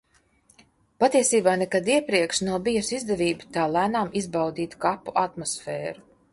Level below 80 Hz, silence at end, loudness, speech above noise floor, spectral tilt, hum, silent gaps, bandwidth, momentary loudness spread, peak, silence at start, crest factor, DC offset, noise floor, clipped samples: -58 dBFS; 0.35 s; -24 LUFS; 38 dB; -3.5 dB/octave; none; none; 11.5 kHz; 10 LU; -6 dBFS; 1 s; 18 dB; under 0.1%; -62 dBFS; under 0.1%